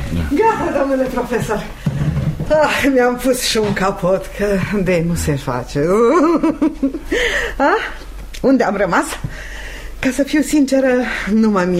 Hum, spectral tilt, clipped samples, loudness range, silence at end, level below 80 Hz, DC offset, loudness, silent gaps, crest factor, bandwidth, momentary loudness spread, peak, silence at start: none; -5.5 dB/octave; under 0.1%; 2 LU; 0 s; -32 dBFS; under 0.1%; -16 LUFS; none; 14 dB; 16 kHz; 9 LU; -2 dBFS; 0 s